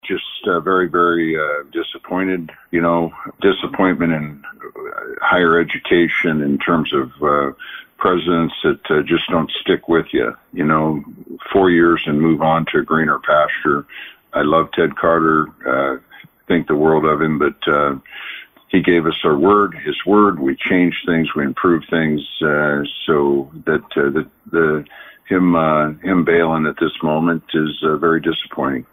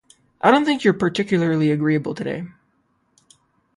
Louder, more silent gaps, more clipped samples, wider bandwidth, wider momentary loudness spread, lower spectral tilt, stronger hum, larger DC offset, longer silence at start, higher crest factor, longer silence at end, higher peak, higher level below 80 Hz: about the same, -17 LUFS vs -19 LUFS; neither; neither; first, 15.5 kHz vs 11.5 kHz; about the same, 10 LU vs 12 LU; first, -8.5 dB/octave vs -6.5 dB/octave; neither; neither; second, 0.05 s vs 0.45 s; about the same, 14 dB vs 18 dB; second, 0.1 s vs 1.3 s; about the same, -2 dBFS vs -2 dBFS; first, -48 dBFS vs -60 dBFS